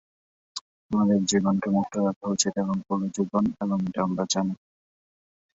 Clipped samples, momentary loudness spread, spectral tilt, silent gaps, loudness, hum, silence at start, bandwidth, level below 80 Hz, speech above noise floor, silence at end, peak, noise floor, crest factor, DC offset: under 0.1%; 14 LU; -5 dB/octave; 0.61-0.90 s, 2.16-2.21 s; -25 LUFS; none; 0.55 s; 8 kHz; -60 dBFS; over 65 dB; 1 s; -8 dBFS; under -90 dBFS; 20 dB; under 0.1%